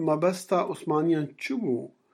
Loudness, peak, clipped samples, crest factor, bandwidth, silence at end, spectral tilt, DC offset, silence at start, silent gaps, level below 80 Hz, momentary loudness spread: -27 LUFS; -10 dBFS; under 0.1%; 16 dB; 14.5 kHz; 0.25 s; -6.5 dB/octave; under 0.1%; 0 s; none; -80 dBFS; 6 LU